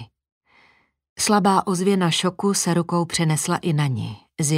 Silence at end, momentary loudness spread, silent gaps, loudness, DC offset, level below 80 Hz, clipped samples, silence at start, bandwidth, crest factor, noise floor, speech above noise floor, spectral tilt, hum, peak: 0 s; 7 LU; 0.32-0.41 s, 1.09-1.16 s; -21 LUFS; under 0.1%; -60 dBFS; under 0.1%; 0 s; 16 kHz; 18 dB; -59 dBFS; 39 dB; -4.5 dB/octave; none; -4 dBFS